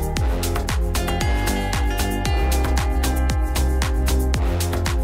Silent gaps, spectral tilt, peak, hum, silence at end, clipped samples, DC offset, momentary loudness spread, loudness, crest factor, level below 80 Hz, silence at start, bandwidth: none; -5 dB/octave; -10 dBFS; none; 0 s; under 0.1%; under 0.1%; 2 LU; -22 LUFS; 10 dB; -22 dBFS; 0 s; 16.5 kHz